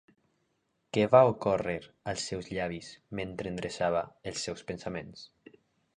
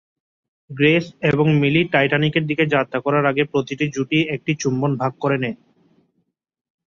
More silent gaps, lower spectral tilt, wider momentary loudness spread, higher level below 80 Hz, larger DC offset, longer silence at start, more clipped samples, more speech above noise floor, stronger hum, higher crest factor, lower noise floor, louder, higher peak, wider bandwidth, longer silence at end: neither; about the same, -5 dB/octave vs -6 dB/octave; first, 17 LU vs 6 LU; about the same, -60 dBFS vs -58 dBFS; neither; first, 0.95 s vs 0.7 s; neither; second, 46 dB vs 52 dB; neither; first, 24 dB vs 16 dB; first, -77 dBFS vs -71 dBFS; second, -31 LUFS vs -19 LUFS; second, -8 dBFS vs -4 dBFS; first, 10.5 kHz vs 7.2 kHz; second, 0.7 s vs 1.3 s